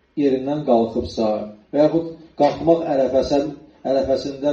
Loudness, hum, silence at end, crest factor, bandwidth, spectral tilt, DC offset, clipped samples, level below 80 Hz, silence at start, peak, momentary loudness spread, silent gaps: -20 LUFS; none; 0 s; 16 dB; 7.8 kHz; -7 dB/octave; under 0.1%; under 0.1%; -48 dBFS; 0.15 s; -4 dBFS; 8 LU; none